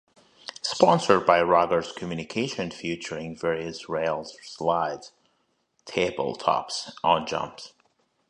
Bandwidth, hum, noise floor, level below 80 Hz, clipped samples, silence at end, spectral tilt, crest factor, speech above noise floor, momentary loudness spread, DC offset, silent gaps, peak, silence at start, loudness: 11 kHz; none; -72 dBFS; -60 dBFS; under 0.1%; 0.65 s; -4.5 dB/octave; 24 dB; 46 dB; 15 LU; under 0.1%; none; -2 dBFS; 0.65 s; -25 LUFS